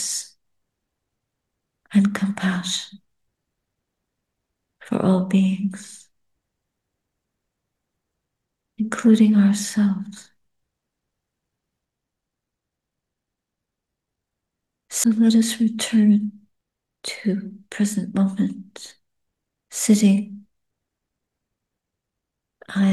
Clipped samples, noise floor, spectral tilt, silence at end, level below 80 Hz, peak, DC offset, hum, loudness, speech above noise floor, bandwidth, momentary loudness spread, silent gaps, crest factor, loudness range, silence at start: under 0.1%; -83 dBFS; -5 dB/octave; 0 s; -70 dBFS; -4 dBFS; under 0.1%; none; -20 LUFS; 64 dB; 12.5 kHz; 20 LU; none; 20 dB; 6 LU; 0 s